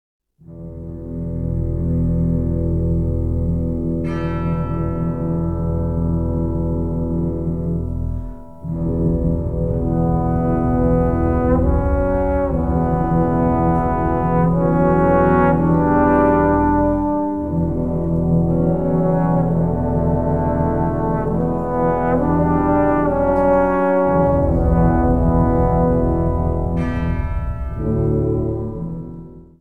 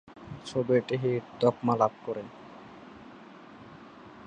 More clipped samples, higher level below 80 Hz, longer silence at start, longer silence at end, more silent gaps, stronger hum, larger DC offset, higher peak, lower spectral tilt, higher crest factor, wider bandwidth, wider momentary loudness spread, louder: neither; first, -26 dBFS vs -66 dBFS; first, 0.2 s vs 0.05 s; about the same, 0 s vs 0 s; neither; neither; first, 1% vs under 0.1%; first, -2 dBFS vs -10 dBFS; first, -11.5 dB/octave vs -7.5 dB/octave; second, 16 dB vs 22 dB; second, 3.3 kHz vs 9.6 kHz; second, 8 LU vs 23 LU; first, -18 LUFS vs -29 LUFS